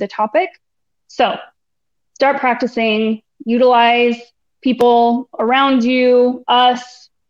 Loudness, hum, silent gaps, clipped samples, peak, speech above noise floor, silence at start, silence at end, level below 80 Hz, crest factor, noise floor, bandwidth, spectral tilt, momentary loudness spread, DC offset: -14 LUFS; none; none; under 0.1%; -2 dBFS; 65 dB; 0 s; 0.45 s; -62 dBFS; 12 dB; -79 dBFS; 7.4 kHz; -5 dB/octave; 11 LU; under 0.1%